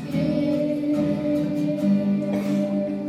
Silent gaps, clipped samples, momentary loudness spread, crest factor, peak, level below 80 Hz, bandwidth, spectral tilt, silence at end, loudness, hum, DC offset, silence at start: none; under 0.1%; 2 LU; 10 dB; -12 dBFS; -58 dBFS; 13 kHz; -8.5 dB/octave; 0 s; -23 LUFS; none; under 0.1%; 0 s